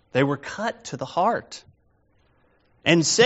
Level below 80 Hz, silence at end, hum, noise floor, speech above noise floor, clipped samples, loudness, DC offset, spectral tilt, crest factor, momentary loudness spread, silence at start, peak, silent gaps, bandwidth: -64 dBFS; 0 s; none; -63 dBFS; 41 dB; under 0.1%; -24 LUFS; under 0.1%; -3.5 dB/octave; 22 dB; 15 LU; 0.15 s; -2 dBFS; none; 8 kHz